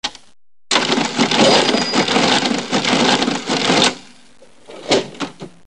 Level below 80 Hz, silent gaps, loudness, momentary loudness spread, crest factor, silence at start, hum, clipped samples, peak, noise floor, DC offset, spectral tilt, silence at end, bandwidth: -54 dBFS; none; -15 LUFS; 15 LU; 18 dB; 0.05 s; none; under 0.1%; 0 dBFS; -48 dBFS; 0.6%; -3 dB/octave; 0.2 s; 11 kHz